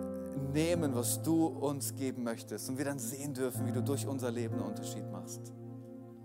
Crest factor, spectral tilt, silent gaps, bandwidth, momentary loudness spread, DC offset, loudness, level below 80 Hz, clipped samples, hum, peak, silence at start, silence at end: 16 dB; -5.5 dB/octave; none; 16 kHz; 14 LU; under 0.1%; -35 LUFS; -70 dBFS; under 0.1%; none; -20 dBFS; 0 s; 0 s